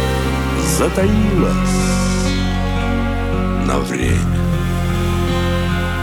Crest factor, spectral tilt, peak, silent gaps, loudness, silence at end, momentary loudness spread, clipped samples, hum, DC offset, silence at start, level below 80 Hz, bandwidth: 14 dB; -5.5 dB/octave; -2 dBFS; none; -17 LUFS; 0 s; 4 LU; under 0.1%; none; under 0.1%; 0 s; -22 dBFS; 19 kHz